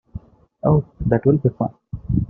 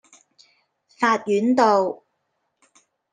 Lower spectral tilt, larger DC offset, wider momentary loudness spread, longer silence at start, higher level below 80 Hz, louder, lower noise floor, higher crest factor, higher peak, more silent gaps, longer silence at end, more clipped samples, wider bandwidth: first, -13 dB/octave vs -5 dB/octave; neither; first, 19 LU vs 10 LU; second, 0.15 s vs 1 s; first, -38 dBFS vs -76 dBFS; about the same, -20 LUFS vs -20 LUFS; second, -38 dBFS vs -74 dBFS; about the same, 18 dB vs 20 dB; about the same, -2 dBFS vs -4 dBFS; neither; second, 0 s vs 1.15 s; neither; second, 2.8 kHz vs 9.6 kHz